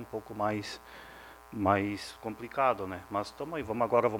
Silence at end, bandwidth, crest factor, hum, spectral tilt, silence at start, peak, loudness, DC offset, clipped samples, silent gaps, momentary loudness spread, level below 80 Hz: 0 s; 19 kHz; 22 dB; none; -6 dB/octave; 0 s; -10 dBFS; -32 LUFS; under 0.1%; under 0.1%; none; 18 LU; -62 dBFS